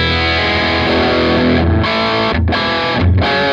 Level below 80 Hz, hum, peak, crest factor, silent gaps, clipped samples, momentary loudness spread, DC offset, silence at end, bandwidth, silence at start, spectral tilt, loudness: -26 dBFS; none; -2 dBFS; 12 dB; none; under 0.1%; 2 LU; under 0.1%; 0 s; 7.4 kHz; 0 s; -6.5 dB/octave; -13 LUFS